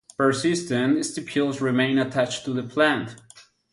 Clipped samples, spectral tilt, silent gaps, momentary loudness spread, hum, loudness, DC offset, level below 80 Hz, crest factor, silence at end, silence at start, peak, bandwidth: under 0.1%; -5 dB/octave; none; 7 LU; none; -23 LUFS; under 0.1%; -64 dBFS; 18 dB; 0.3 s; 0.2 s; -6 dBFS; 11.5 kHz